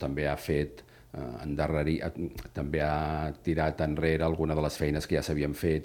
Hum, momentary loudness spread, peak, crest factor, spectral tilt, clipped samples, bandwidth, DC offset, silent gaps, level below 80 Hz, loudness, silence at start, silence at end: none; 10 LU; -12 dBFS; 18 dB; -6.5 dB/octave; under 0.1%; 18.5 kHz; under 0.1%; none; -42 dBFS; -31 LUFS; 0 s; 0 s